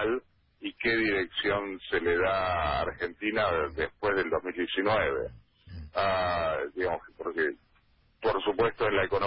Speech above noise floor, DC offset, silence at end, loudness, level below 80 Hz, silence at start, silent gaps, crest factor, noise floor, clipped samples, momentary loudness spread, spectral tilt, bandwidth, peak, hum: 36 dB; under 0.1%; 0 s; -29 LUFS; -50 dBFS; 0 s; none; 16 dB; -65 dBFS; under 0.1%; 9 LU; -9 dB/octave; 5.6 kHz; -14 dBFS; none